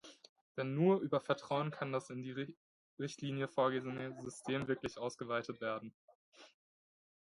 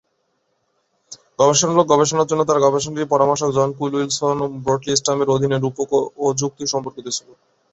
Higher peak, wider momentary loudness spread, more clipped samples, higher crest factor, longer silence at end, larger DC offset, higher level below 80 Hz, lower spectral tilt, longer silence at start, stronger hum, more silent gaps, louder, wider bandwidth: second, -20 dBFS vs -2 dBFS; first, 12 LU vs 8 LU; neither; about the same, 20 dB vs 18 dB; first, 0.9 s vs 0.55 s; neither; second, -76 dBFS vs -56 dBFS; first, -6 dB/octave vs -4 dB/octave; second, 0.05 s vs 1.1 s; neither; first, 0.29-0.55 s, 2.57-2.97 s, 5.94-6.08 s, 6.15-6.32 s vs none; second, -39 LUFS vs -18 LUFS; first, 11.5 kHz vs 8.2 kHz